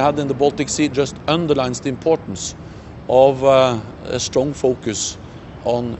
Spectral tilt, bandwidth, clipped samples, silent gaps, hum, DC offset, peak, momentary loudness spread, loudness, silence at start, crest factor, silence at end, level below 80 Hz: -4.5 dB/octave; 8.4 kHz; under 0.1%; none; none; under 0.1%; 0 dBFS; 14 LU; -18 LUFS; 0 s; 18 dB; 0 s; -44 dBFS